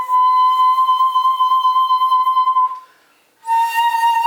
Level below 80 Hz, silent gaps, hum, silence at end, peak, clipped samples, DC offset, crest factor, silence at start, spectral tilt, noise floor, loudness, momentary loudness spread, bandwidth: -70 dBFS; none; none; 0 s; -6 dBFS; under 0.1%; under 0.1%; 8 dB; 0 s; 2.5 dB/octave; -55 dBFS; -14 LUFS; 6 LU; 19.5 kHz